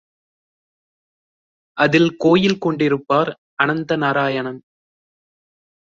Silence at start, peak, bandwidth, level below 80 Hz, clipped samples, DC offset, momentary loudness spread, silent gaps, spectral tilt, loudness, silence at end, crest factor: 1.75 s; -2 dBFS; 7.6 kHz; -60 dBFS; under 0.1%; under 0.1%; 10 LU; 3.38-3.57 s; -6.5 dB/octave; -18 LUFS; 1.35 s; 18 dB